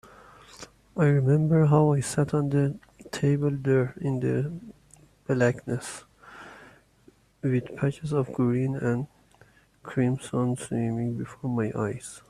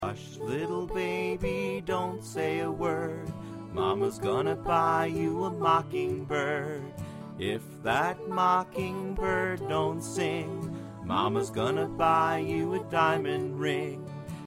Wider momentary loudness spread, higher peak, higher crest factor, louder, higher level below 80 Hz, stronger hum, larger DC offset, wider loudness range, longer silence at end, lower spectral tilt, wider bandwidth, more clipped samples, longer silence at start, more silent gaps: first, 21 LU vs 11 LU; first, -6 dBFS vs -12 dBFS; about the same, 20 dB vs 18 dB; first, -26 LUFS vs -30 LUFS; second, -58 dBFS vs -52 dBFS; neither; neither; first, 7 LU vs 3 LU; about the same, 0.1 s vs 0 s; first, -7.5 dB/octave vs -6 dB/octave; second, 12.5 kHz vs 16 kHz; neither; first, 0.6 s vs 0 s; neither